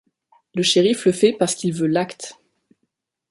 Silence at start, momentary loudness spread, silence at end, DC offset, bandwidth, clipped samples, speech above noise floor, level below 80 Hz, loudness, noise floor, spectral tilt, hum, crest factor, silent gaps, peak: 0.55 s; 14 LU; 1 s; under 0.1%; 11.5 kHz; under 0.1%; 56 dB; -64 dBFS; -19 LUFS; -75 dBFS; -4.5 dB/octave; none; 18 dB; none; -4 dBFS